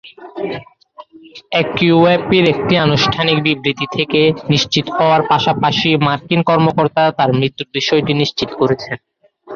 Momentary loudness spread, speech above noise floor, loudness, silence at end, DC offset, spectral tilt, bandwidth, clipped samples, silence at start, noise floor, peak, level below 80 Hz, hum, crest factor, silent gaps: 8 LU; 25 dB; -14 LUFS; 0 s; under 0.1%; -5.5 dB/octave; 7.2 kHz; under 0.1%; 0.05 s; -40 dBFS; -2 dBFS; -48 dBFS; none; 14 dB; none